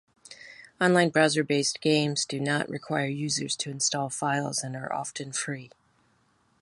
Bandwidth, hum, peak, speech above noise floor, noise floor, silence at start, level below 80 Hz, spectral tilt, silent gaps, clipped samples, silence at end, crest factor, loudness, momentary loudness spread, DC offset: 11.5 kHz; none; -6 dBFS; 40 dB; -67 dBFS; 0.3 s; -72 dBFS; -3.5 dB/octave; none; under 0.1%; 0.95 s; 22 dB; -27 LUFS; 12 LU; under 0.1%